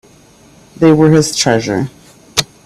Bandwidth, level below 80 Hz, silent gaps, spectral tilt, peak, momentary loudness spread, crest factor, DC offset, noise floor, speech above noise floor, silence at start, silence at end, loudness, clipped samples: 15 kHz; -46 dBFS; none; -5 dB/octave; 0 dBFS; 10 LU; 14 dB; under 0.1%; -44 dBFS; 33 dB; 0.8 s; 0.25 s; -12 LUFS; under 0.1%